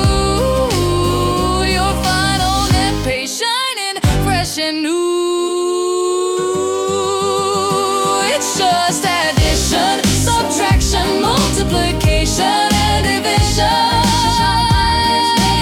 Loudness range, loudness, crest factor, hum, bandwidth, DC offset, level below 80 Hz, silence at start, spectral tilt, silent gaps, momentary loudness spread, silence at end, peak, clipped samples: 3 LU; -14 LUFS; 12 dB; none; 18 kHz; under 0.1%; -24 dBFS; 0 s; -4 dB/octave; none; 4 LU; 0 s; -2 dBFS; under 0.1%